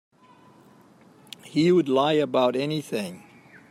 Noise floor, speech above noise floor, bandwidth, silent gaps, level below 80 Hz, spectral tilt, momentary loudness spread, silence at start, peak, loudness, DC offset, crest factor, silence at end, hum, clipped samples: -54 dBFS; 32 dB; 14 kHz; none; -72 dBFS; -6 dB/octave; 16 LU; 1.45 s; -8 dBFS; -23 LUFS; under 0.1%; 16 dB; 0.55 s; none; under 0.1%